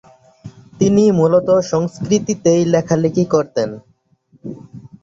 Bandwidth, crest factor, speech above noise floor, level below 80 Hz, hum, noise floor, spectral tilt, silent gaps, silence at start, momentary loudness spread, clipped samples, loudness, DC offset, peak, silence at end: 7.8 kHz; 16 dB; 41 dB; -52 dBFS; none; -55 dBFS; -6.5 dB/octave; none; 0.45 s; 21 LU; under 0.1%; -15 LUFS; under 0.1%; -2 dBFS; 0.15 s